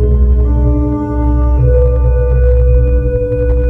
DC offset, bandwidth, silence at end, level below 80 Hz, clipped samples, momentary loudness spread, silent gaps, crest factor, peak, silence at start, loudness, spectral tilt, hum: under 0.1%; 2.6 kHz; 0 s; -10 dBFS; under 0.1%; 4 LU; none; 10 dB; 0 dBFS; 0 s; -12 LUFS; -12 dB/octave; none